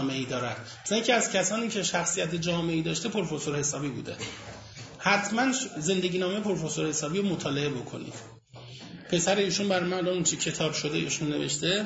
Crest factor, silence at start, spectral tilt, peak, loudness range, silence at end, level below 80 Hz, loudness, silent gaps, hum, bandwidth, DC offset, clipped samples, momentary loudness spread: 20 dB; 0 s; -3.5 dB/octave; -8 dBFS; 3 LU; 0 s; -60 dBFS; -28 LUFS; none; none; 8.2 kHz; under 0.1%; under 0.1%; 16 LU